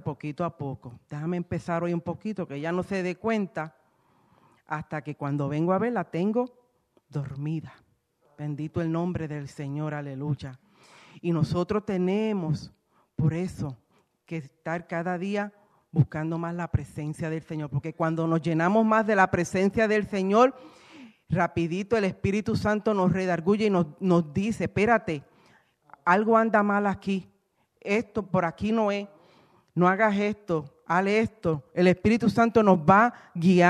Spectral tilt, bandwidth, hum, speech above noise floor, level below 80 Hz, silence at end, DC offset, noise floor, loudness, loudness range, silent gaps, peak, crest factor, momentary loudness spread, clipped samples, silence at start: -7.5 dB/octave; 11 kHz; none; 45 dB; -56 dBFS; 0 s; under 0.1%; -70 dBFS; -26 LUFS; 8 LU; none; -6 dBFS; 20 dB; 14 LU; under 0.1%; 0.05 s